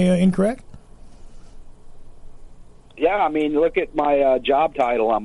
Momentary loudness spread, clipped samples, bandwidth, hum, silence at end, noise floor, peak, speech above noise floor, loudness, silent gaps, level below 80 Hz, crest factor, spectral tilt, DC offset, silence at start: 5 LU; under 0.1%; 11.5 kHz; none; 0 s; -42 dBFS; -6 dBFS; 24 dB; -19 LUFS; none; -42 dBFS; 14 dB; -7.5 dB/octave; under 0.1%; 0 s